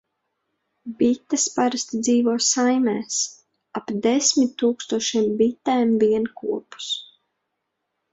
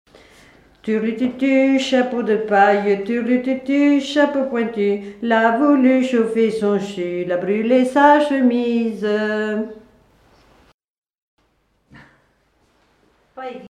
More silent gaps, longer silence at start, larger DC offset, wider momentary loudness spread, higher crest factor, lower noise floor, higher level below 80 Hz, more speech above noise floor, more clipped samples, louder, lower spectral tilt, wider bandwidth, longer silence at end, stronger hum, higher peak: second, none vs 10.74-10.79 s, 10.90-11.02 s, 11.18-11.37 s; about the same, 0.85 s vs 0.85 s; neither; about the same, 11 LU vs 9 LU; about the same, 16 dB vs 18 dB; first, -78 dBFS vs -63 dBFS; second, -66 dBFS vs -60 dBFS; first, 57 dB vs 47 dB; neither; second, -21 LUFS vs -17 LUFS; second, -3 dB/octave vs -6 dB/octave; second, 8 kHz vs 10.5 kHz; first, 1.1 s vs 0 s; neither; second, -6 dBFS vs 0 dBFS